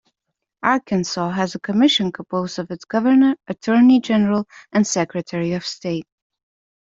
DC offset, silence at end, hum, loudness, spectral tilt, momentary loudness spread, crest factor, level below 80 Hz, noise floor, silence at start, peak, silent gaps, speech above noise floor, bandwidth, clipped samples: under 0.1%; 0.95 s; none; -19 LUFS; -5 dB/octave; 11 LU; 18 dB; -60 dBFS; -80 dBFS; 0.65 s; -2 dBFS; none; 61 dB; 7.8 kHz; under 0.1%